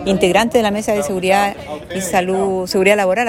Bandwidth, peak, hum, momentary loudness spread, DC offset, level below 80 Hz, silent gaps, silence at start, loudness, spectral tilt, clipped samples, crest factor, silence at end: 16.5 kHz; 0 dBFS; none; 8 LU; under 0.1%; -44 dBFS; none; 0 s; -16 LUFS; -4.5 dB/octave; under 0.1%; 16 dB; 0 s